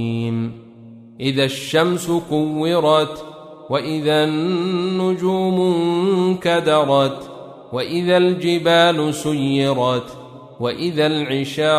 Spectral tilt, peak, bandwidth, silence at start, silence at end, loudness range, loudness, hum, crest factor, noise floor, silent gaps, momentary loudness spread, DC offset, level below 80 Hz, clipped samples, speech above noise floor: -5.5 dB/octave; -2 dBFS; 15 kHz; 0 s; 0 s; 2 LU; -18 LUFS; none; 16 dB; -41 dBFS; none; 11 LU; under 0.1%; -58 dBFS; under 0.1%; 23 dB